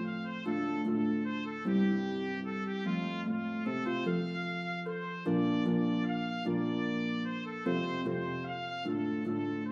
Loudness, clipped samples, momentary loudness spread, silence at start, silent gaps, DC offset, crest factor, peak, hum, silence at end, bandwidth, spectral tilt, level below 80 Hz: -33 LUFS; under 0.1%; 7 LU; 0 s; none; under 0.1%; 14 dB; -18 dBFS; none; 0 s; 7.2 kHz; -7.5 dB/octave; -78 dBFS